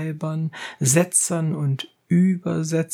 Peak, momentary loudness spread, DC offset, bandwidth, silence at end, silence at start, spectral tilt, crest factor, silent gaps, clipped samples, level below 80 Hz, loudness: -4 dBFS; 10 LU; under 0.1%; 16.5 kHz; 0 s; 0 s; -5 dB/octave; 18 dB; none; under 0.1%; -68 dBFS; -21 LUFS